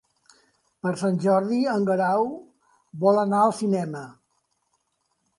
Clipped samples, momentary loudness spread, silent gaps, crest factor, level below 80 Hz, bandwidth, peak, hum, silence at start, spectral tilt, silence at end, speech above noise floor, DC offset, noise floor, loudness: under 0.1%; 16 LU; none; 18 dB; -72 dBFS; 11.5 kHz; -6 dBFS; none; 0.85 s; -7 dB/octave; 1.25 s; 51 dB; under 0.1%; -74 dBFS; -23 LUFS